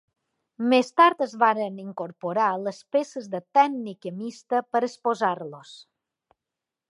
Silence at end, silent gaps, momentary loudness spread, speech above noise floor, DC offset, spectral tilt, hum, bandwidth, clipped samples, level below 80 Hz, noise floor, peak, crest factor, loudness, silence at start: 1.1 s; none; 15 LU; 63 dB; under 0.1%; -5 dB/octave; none; 11.5 kHz; under 0.1%; -84 dBFS; -88 dBFS; -4 dBFS; 20 dB; -24 LUFS; 0.6 s